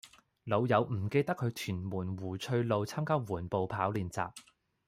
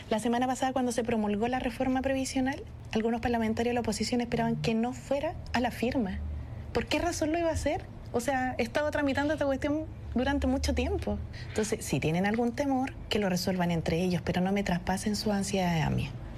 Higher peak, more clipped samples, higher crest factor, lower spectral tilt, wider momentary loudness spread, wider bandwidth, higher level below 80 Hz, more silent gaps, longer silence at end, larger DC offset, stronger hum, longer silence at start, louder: about the same, -14 dBFS vs -16 dBFS; neither; first, 20 dB vs 14 dB; about the same, -6.5 dB/octave vs -5.5 dB/octave; first, 9 LU vs 5 LU; first, 16 kHz vs 13.5 kHz; second, -66 dBFS vs -44 dBFS; neither; first, 0.45 s vs 0 s; neither; neither; about the same, 0.05 s vs 0 s; second, -34 LUFS vs -30 LUFS